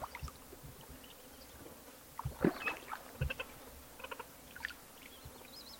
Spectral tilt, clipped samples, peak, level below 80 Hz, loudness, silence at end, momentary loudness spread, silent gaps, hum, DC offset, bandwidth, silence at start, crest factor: -5 dB/octave; under 0.1%; -16 dBFS; -56 dBFS; -44 LUFS; 0 s; 17 LU; none; none; under 0.1%; 16.5 kHz; 0 s; 30 dB